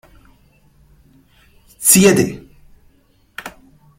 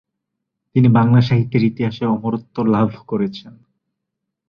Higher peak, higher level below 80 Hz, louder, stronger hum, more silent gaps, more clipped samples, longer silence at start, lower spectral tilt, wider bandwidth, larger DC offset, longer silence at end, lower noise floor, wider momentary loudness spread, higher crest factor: about the same, 0 dBFS vs -2 dBFS; about the same, -50 dBFS vs -52 dBFS; first, -12 LUFS vs -17 LUFS; neither; neither; neither; first, 1.8 s vs 0.75 s; second, -3.5 dB/octave vs -9.5 dB/octave; first, 16.5 kHz vs 6 kHz; neither; second, 0.5 s vs 1 s; second, -55 dBFS vs -79 dBFS; first, 27 LU vs 10 LU; about the same, 20 dB vs 16 dB